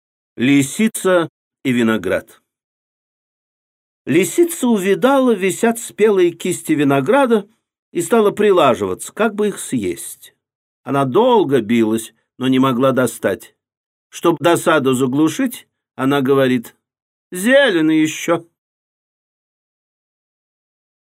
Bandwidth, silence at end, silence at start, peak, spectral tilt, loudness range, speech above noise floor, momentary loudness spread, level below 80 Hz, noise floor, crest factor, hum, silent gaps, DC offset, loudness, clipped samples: 16 kHz; 2.6 s; 0.4 s; 0 dBFS; -5 dB/octave; 5 LU; over 75 dB; 10 LU; -64 dBFS; under -90 dBFS; 16 dB; none; 1.29-1.51 s, 2.64-4.05 s, 7.79-7.92 s, 10.55-10.83 s, 13.77-14.10 s, 17.02-17.31 s; under 0.1%; -16 LUFS; under 0.1%